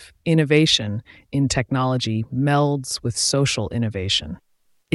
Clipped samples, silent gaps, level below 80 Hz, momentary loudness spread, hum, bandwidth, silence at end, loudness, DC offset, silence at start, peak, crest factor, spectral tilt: under 0.1%; none; -46 dBFS; 11 LU; none; 12 kHz; 0.6 s; -20 LUFS; under 0.1%; 0 s; -4 dBFS; 18 dB; -4.5 dB/octave